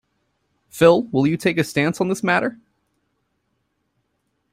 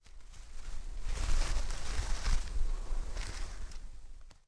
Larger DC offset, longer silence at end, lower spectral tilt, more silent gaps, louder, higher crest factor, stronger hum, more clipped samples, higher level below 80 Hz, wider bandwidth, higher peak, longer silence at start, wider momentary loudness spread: neither; first, 2 s vs 0.15 s; first, -6 dB/octave vs -3.5 dB/octave; neither; first, -19 LUFS vs -41 LUFS; about the same, 20 dB vs 16 dB; neither; neither; second, -60 dBFS vs -34 dBFS; first, 16 kHz vs 11 kHz; first, -2 dBFS vs -16 dBFS; first, 0.75 s vs 0.1 s; second, 7 LU vs 17 LU